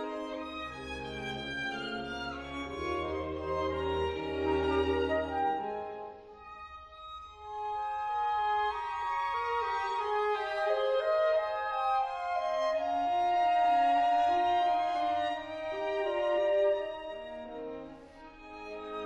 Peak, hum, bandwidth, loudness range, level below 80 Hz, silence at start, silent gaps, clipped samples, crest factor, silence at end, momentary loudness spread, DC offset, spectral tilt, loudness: -18 dBFS; none; 10 kHz; 7 LU; -54 dBFS; 0 s; none; under 0.1%; 14 dB; 0 s; 17 LU; under 0.1%; -5.5 dB/octave; -32 LUFS